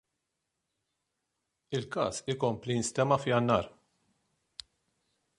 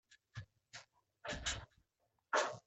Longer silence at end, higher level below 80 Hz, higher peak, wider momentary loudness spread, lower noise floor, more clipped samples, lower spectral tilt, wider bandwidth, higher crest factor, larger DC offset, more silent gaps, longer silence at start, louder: first, 1.7 s vs 0.1 s; about the same, -64 dBFS vs -60 dBFS; first, -12 dBFS vs -22 dBFS; about the same, 21 LU vs 19 LU; about the same, -84 dBFS vs -84 dBFS; neither; first, -5 dB/octave vs -2 dB/octave; first, 11.5 kHz vs 8.6 kHz; about the same, 22 dB vs 24 dB; neither; neither; first, 1.7 s vs 0.1 s; first, -30 LUFS vs -41 LUFS